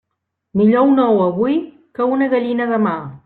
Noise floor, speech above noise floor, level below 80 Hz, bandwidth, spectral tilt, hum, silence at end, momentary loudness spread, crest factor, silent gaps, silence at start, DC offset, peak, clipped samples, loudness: -76 dBFS; 61 dB; -58 dBFS; 4.3 kHz; -10.5 dB/octave; none; 0.1 s; 9 LU; 14 dB; none; 0.55 s; under 0.1%; -2 dBFS; under 0.1%; -16 LUFS